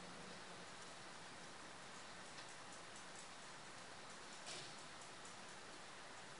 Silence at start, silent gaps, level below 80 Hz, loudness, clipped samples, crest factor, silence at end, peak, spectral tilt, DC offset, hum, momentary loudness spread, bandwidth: 0 s; none; -82 dBFS; -54 LUFS; under 0.1%; 18 dB; 0 s; -38 dBFS; -2 dB/octave; under 0.1%; none; 4 LU; 10.5 kHz